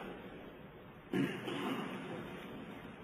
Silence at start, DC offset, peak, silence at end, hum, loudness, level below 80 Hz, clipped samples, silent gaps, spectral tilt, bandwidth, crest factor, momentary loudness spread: 0 s; under 0.1%; -22 dBFS; 0 s; none; -42 LUFS; -68 dBFS; under 0.1%; none; -6 dB/octave; 15.5 kHz; 20 dB; 15 LU